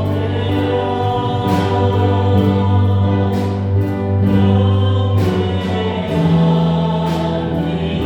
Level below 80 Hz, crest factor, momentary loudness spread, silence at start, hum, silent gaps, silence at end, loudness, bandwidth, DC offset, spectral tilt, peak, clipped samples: -40 dBFS; 12 dB; 5 LU; 0 s; none; none; 0 s; -16 LUFS; 8 kHz; under 0.1%; -8.5 dB/octave; -2 dBFS; under 0.1%